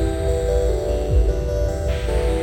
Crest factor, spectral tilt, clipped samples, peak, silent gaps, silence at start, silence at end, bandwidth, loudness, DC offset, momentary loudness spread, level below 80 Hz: 12 dB; -7 dB/octave; under 0.1%; -8 dBFS; none; 0 s; 0 s; 16 kHz; -22 LUFS; under 0.1%; 3 LU; -22 dBFS